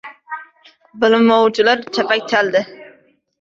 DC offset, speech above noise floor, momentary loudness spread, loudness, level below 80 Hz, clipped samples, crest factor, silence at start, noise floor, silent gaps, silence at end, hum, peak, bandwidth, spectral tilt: under 0.1%; 37 dB; 19 LU; -15 LUFS; -62 dBFS; under 0.1%; 16 dB; 0.05 s; -52 dBFS; none; 0.55 s; none; 0 dBFS; 7.6 kHz; -4.5 dB/octave